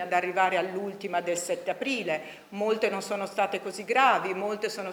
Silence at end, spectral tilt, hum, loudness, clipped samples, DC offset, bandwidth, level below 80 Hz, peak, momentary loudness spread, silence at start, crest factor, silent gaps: 0 s; -3.5 dB/octave; none; -28 LUFS; under 0.1%; under 0.1%; over 20 kHz; -78 dBFS; -8 dBFS; 9 LU; 0 s; 20 dB; none